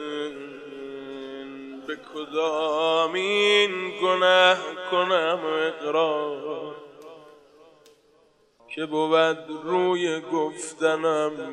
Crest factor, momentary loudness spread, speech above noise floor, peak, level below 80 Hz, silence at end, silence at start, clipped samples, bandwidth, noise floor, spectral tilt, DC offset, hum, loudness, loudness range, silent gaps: 18 dB; 19 LU; 37 dB; -6 dBFS; -76 dBFS; 0 s; 0 s; under 0.1%; 11 kHz; -61 dBFS; -3.5 dB/octave; under 0.1%; none; -23 LUFS; 8 LU; none